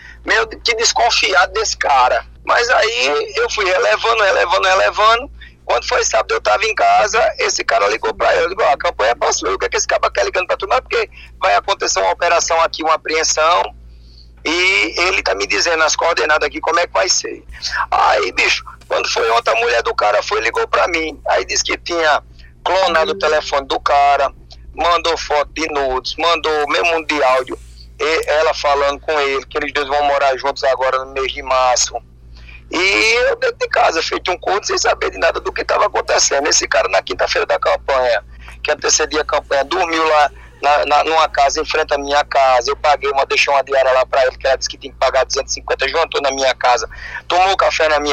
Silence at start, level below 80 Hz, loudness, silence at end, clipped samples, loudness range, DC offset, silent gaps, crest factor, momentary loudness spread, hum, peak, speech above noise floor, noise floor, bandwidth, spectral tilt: 0 s; -40 dBFS; -15 LUFS; 0 s; under 0.1%; 2 LU; under 0.1%; none; 16 dB; 6 LU; none; 0 dBFS; 25 dB; -40 dBFS; 13.5 kHz; -1 dB/octave